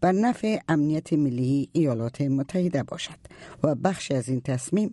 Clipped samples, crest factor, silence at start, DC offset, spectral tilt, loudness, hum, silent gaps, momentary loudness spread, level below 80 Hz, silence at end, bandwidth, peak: under 0.1%; 16 dB; 0 s; under 0.1%; -6.5 dB/octave; -26 LUFS; none; none; 7 LU; -60 dBFS; 0 s; 11.5 kHz; -8 dBFS